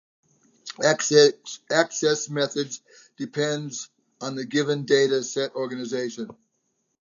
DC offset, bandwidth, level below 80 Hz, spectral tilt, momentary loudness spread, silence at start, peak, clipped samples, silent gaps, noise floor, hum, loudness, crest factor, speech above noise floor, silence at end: under 0.1%; 7.6 kHz; -78 dBFS; -3.5 dB/octave; 19 LU; 0.65 s; -2 dBFS; under 0.1%; none; -74 dBFS; none; -24 LUFS; 22 dB; 50 dB; 0.7 s